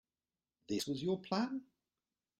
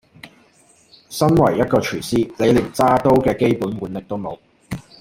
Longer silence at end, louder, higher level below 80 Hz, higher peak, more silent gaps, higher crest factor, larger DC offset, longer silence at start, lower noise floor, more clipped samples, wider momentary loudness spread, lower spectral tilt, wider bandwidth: first, 0.75 s vs 0.2 s; second, -39 LUFS vs -18 LUFS; second, -76 dBFS vs -44 dBFS; second, -22 dBFS vs -2 dBFS; neither; about the same, 20 dB vs 18 dB; neither; first, 0.7 s vs 0.25 s; first, under -90 dBFS vs -54 dBFS; neither; second, 5 LU vs 17 LU; second, -5 dB/octave vs -6.5 dB/octave; second, 13.5 kHz vs 16.5 kHz